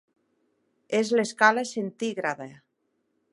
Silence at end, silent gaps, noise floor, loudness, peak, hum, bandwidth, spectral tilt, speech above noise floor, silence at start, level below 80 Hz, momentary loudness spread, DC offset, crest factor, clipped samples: 0.75 s; none; -75 dBFS; -25 LUFS; -4 dBFS; none; 11.5 kHz; -4 dB/octave; 50 dB; 0.9 s; -80 dBFS; 12 LU; under 0.1%; 24 dB; under 0.1%